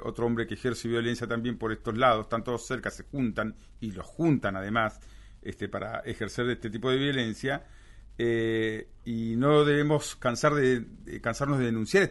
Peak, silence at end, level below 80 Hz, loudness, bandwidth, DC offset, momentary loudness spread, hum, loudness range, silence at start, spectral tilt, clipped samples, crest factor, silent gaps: -10 dBFS; 0 s; -50 dBFS; -29 LUFS; 11.5 kHz; under 0.1%; 12 LU; none; 5 LU; 0 s; -5.5 dB/octave; under 0.1%; 18 dB; none